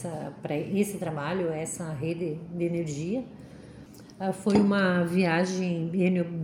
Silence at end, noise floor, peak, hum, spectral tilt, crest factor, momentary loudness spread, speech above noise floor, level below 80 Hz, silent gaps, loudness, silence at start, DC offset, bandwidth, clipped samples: 0 s; -47 dBFS; -10 dBFS; none; -6.5 dB/octave; 18 dB; 20 LU; 20 dB; -62 dBFS; none; -28 LUFS; 0 s; under 0.1%; 15.5 kHz; under 0.1%